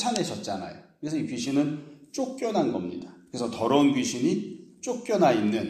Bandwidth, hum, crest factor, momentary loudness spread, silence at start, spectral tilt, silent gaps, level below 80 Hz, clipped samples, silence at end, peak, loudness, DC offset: 13.5 kHz; none; 22 dB; 16 LU; 0 s; -5 dB/octave; none; -68 dBFS; under 0.1%; 0 s; -6 dBFS; -27 LUFS; under 0.1%